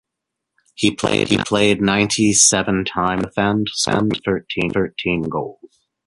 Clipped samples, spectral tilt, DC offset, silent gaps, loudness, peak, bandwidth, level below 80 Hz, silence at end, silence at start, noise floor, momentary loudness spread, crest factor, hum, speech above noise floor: under 0.1%; -3.5 dB/octave; under 0.1%; none; -17 LUFS; 0 dBFS; 11.5 kHz; -46 dBFS; 0.4 s; 0.8 s; -81 dBFS; 9 LU; 18 dB; none; 63 dB